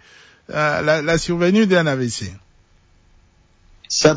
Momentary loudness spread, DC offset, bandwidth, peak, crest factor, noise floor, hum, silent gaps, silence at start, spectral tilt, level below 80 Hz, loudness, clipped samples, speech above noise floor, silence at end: 12 LU; under 0.1%; 8 kHz; -2 dBFS; 18 dB; -54 dBFS; none; none; 0.5 s; -4.5 dB/octave; -46 dBFS; -18 LUFS; under 0.1%; 37 dB; 0 s